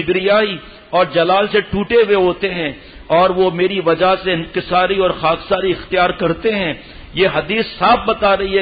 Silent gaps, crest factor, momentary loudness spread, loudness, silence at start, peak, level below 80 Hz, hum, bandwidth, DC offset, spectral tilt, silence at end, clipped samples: none; 14 dB; 7 LU; -15 LUFS; 0 s; -2 dBFS; -40 dBFS; none; 5 kHz; under 0.1%; -10.5 dB/octave; 0 s; under 0.1%